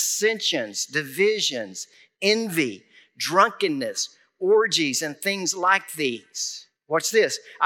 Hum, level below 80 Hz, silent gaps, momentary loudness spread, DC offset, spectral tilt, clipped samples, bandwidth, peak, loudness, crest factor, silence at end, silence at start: none; -90 dBFS; none; 10 LU; under 0.1%; -2 dB/octave; under 0.1%; 19 kHz; -4 dBFS; -23 LUFS; 20 dB; 0 s; 0 s